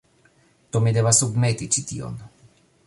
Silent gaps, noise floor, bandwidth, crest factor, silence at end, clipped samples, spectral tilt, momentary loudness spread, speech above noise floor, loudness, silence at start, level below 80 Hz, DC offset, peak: none; -59 dBFS; 11.5 kHz; 20 dB; 0.6 s; under 0.1%; -4 dB/octave; 16 LU; 38 dB; -21 LUFS; 0.75 s; -54 dBFS; under 0.1%; -4 dBFS